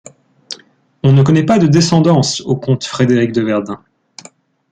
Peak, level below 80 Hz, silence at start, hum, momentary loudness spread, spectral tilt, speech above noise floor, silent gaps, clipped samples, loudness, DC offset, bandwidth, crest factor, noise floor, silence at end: -2 dBFS; -50 dBFS; 0.5 s; none; 20 LU; -6 dB/octave; 34 dB; none; under 0.1%; -13 LUFS; under 0.1%; 9.4 kHz; 12 dB; -46 dBFS; 0.95 s